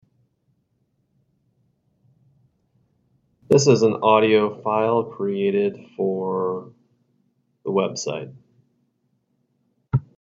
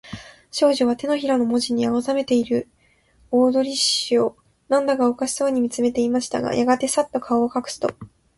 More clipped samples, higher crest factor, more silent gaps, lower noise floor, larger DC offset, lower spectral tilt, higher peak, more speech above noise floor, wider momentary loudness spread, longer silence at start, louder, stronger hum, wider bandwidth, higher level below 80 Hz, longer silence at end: neither; about the same, 20 dB vs 16 dB; neither; first, -70 dBFS vs -58 dBFS; neither; first, -5.5 dB/octave vs -3.5 dB/octave; about the same, -2 dBFS vs -4 dBFS; first, 50 dB vs 38 dB; first, 13 LU vs 7 LU; first, 3.5 s vs 0.05 s; about the same, -21 LUFS vs -21 LUFS; neither; second, 7.8 kHz vs 11.5 kHz; about the same, -58 dBFS vs -58 dBFS; about the same, 0.25 s vs 0.3 s